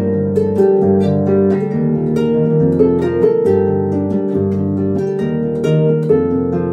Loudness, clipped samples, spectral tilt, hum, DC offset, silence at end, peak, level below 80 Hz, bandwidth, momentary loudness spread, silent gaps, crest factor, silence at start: -15 LUFS; under 0.1%; -10 dB/octave; none; under 0.1%; 0 s; -2 dBFS; -46 dBFS; 8.8 kHz; 4 LU; none; 12 dB; 0 s